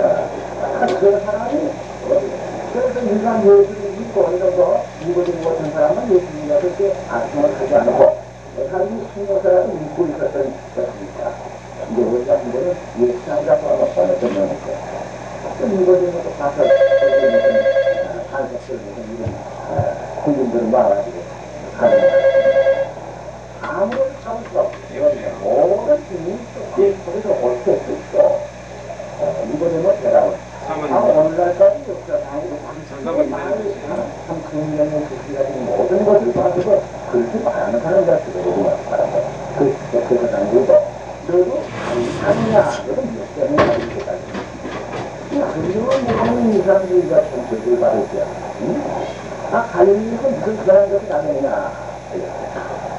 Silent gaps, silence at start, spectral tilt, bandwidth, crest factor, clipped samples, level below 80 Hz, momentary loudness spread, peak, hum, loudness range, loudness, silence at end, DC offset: none; 0 s; -6.5 dB/octave; 8.4 kHz; 18 dB; under 0.1%; -46 dBFS; 13 LU; 0 dBFS; none; 4 LU; -18 LUFS; 0 s; 0.2%